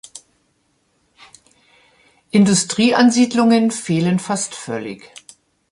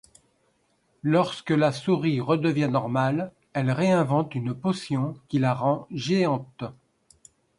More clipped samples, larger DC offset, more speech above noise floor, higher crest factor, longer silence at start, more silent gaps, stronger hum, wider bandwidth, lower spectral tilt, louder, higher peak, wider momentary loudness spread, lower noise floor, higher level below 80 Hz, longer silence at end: neither; neither; first, 48 dB vs 44 dB; about the same, 16 dB vs 18 dB; second, 0.15 s vs 1.05 s; neither; neither; about the same, 11.5 kHz vs 11 kHz; second, -4.5 dB/octave vs -7 dB/octave; first, -16 LUFS vs -25 LUFS; first, -2 dBFS vs -8 dBFS; first, 14 LU vs 8 LU; second, -64 dBFS vs -68 dBFS; about the same, -62 dBFS vs -64 dBFS; about the same, 0.75 s vs 0.85 s